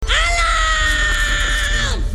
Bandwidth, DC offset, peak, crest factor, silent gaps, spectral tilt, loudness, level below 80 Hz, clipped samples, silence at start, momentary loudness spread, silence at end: 13.5 kHz; under 0.1%; -2 dBFS; 14 dB; none; -2 dB/octave; -16 LUFS; -20 dBFS; under 0.1%; 0 s; 3 LU; 0 s